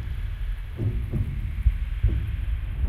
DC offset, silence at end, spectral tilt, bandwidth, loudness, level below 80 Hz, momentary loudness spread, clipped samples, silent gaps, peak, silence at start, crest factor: under 0.1%; 0 s; -8.5 dB/octave; 4.3 kHz; -29 LUFS; -28 dBFS; 7 LU; under 0.1%; none; -8 dBFS; 0 s; 18 dB